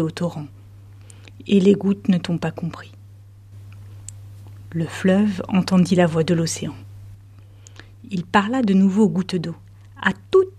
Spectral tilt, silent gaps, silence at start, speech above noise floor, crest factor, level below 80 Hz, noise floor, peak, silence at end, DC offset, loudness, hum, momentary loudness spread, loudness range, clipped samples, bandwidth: -6.5 dB/octave; none; 0 s; 25 dB; 20 dB; -54 dBFS; -44 dBFS; -2 dBFS; 0.1 s; under 0.1%; -20 LUFS; none; 23 LU; 5 LU; under 0.1%; 12 kHz